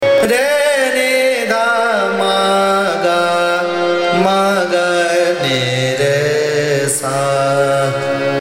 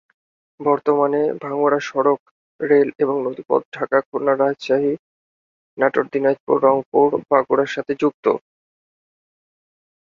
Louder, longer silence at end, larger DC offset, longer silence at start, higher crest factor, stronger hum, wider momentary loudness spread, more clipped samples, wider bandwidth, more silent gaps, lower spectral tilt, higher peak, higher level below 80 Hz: first, -14 LUFS vs -19 LUFS; second, 0 s vs 1.8 s; neither; second, 0 s vs 0.6 s; about the same, 14 dB vs 18 dB; neither; second, 3 LU vs 6 LU; neither; first, 16.5 kHz vs 7.2 kHz; second, none vs 2.20-2.59 s, 3.65-3.72 s, 4.06-4.12 s, 4.99-5.77 s, 6.40-6.47 s, 6.86-6.92 s, 8.14-8.23 s; second, -4 dB/octave vs -6.5 dB/octave; about the same, 0 dBFS vs -2 dBFS; first, -58 dBFS vs -66 dBFS